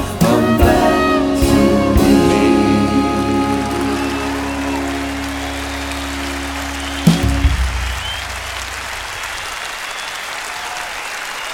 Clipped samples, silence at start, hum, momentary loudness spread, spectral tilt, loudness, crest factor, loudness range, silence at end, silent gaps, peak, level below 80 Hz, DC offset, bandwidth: under 0.1%; 0 s; none; 11 LU; -5 dB/octave; -17 LUFS; 16 dB; 9 LU; 0 s; none; 0 dBFS; -26 dBFS; under 0.1%; 19 kHz